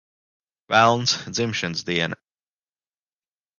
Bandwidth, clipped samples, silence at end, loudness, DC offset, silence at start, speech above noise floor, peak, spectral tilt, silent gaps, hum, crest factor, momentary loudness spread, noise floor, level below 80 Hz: 10 kHz; under 0.1%; 1.45 s; -21 LUFS; under 0.1%; 0.7 s; over 69 dB; -2 dBFS; -3.5 dB/octave; none; none; 22 dB; 9 LU; under -90 dBFS; -60 dBFS